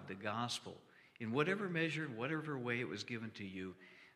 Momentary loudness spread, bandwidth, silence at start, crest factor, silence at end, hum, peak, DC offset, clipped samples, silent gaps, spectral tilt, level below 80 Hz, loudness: 13 LU; 14 kHz; 0 s; 22 dB; 0.05 s; none; -20 dBFS; under 0.1%; under 0.1%; none; -5 dB/octave; -84 dBFS; -41 LUFS